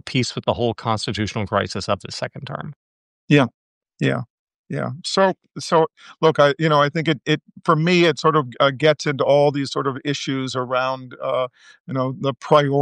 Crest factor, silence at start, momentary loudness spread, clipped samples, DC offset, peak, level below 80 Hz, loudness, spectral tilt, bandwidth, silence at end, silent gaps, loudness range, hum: 18 dB; 0.05 s; 12 LU; under 0.1%; under 0.1%; -2 dBFS; -60 dBFS; -20 LUFS; -5.5 dB/octave; 10.5 kHz; 0 s; 2.76-3.28 s, 3.54-3.81 s, 4.30-4.47 s, 4.54-4.64 s, 11.80-11.85 s; 6 LU; none